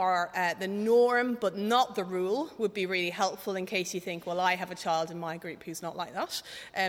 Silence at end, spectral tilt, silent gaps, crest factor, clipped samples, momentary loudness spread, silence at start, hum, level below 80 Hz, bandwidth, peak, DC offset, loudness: 0 s; -4 dB/octave; none; 20 dB; under 0.1%; 11 LU; 0 s; none; -74 dBFS; 18 kHz; -10 dBFS; under 0.1%; -30 LUFS